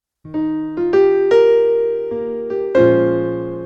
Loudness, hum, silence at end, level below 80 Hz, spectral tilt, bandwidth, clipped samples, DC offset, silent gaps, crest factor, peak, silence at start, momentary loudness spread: -16 LUFS; none; 0 s; -50 dBFS; -8 dB/octave; 6.6 kHz; under 0.1%; under 0.1%; none; 14 dB; -2 dBFS; 0.25 s; 11 LU